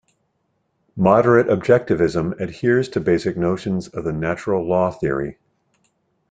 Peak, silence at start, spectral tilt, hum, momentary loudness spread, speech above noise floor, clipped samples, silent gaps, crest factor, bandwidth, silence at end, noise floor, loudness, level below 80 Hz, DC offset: -2 dBFS; 0.95 s; -7.5 dB/octave; none; 10 LU; 51 dB; under 0.1%; none; 18 dB; 9.2 kHz; 1 s; -69 dBFS; -19 LUFS; -50 dBFS; under 0.1%